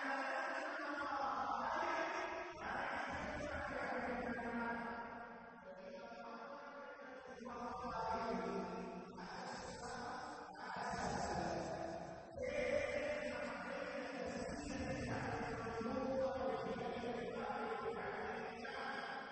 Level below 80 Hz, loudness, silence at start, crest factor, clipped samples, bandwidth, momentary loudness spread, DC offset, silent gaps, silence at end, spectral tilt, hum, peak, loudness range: -64 dBFS; -44 LUFS; 0 s; 18 dB; under 0.1%; 8.4 kHz; 11 LU; under 0.1%; none; 0 s; -5 dB/octave; none; -28 dBFS; 4 LU